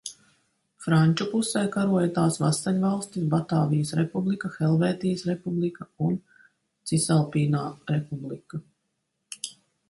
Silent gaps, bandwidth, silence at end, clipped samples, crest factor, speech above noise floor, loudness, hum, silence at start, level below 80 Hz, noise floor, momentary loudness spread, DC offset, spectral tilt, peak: none; 11.5 kHz; 0.4 s; under 0.1%; 16 dB; 53 dB; -26 LUFS; none; 0.05 s; -64 dBFS; -78 dBFS; 14 LU; under 0.1%; -6 dB/octave; -10 dBFS